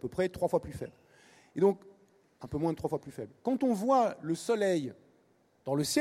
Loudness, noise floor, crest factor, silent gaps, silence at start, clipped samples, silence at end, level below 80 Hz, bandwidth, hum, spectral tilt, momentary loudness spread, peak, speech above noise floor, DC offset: -31 LUFS; -68 dBFS; 18 dB; none; 0.05 s; under 0.1%; 0 s; -62 dBFS; 16 kHz; none; -5.5 dB/octave; 16 LU; -14 dBFS; 37 dB; under 0.1%